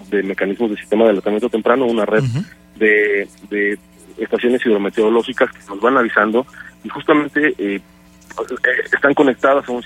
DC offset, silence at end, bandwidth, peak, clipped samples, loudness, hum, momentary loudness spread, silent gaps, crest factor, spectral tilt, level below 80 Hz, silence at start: under 0.1%; 0 s; 12.5 kHz; 0 dBFS; under 0.1%; -16 LUFS; none; 13 LU; none; 16 dB; -6.5 dB/octave; -56 dBFS; 0 s